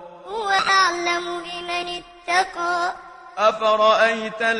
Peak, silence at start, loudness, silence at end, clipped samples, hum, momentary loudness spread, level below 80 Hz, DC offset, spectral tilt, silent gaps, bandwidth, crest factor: -4 dBFS; 0 s; -20 LUFS; 0 s; under 0.1%; none; 14 LU; -58 dBFS; under 0.1%; -2 dB/octave; none; 11 kHz; 18 dB